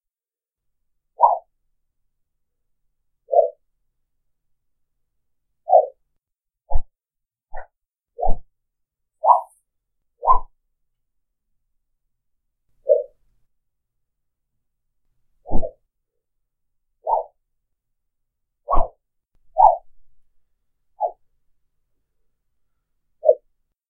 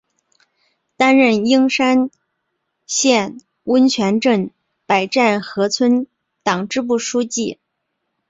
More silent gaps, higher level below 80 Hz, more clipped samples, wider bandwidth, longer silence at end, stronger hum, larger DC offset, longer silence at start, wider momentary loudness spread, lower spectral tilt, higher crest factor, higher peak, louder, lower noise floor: neither; first, -34 dBFS vs -62 dBFS; neither; second, 2 kHz vs 8 kHz; second, 0.55 s vs 0.75 s; neither; neither; first, 1.2 s vs 1 s; first, 19 LU vs 11 LU; first, -10 dB/octave vs -3.5 dB/octave; first, 24 dB vs 18 dB; about the same, 0 dBFS vs 0 dBFS; second, -21 LUFS vs -16 LUFS; first, under -90 dBFS vs -74 dBFS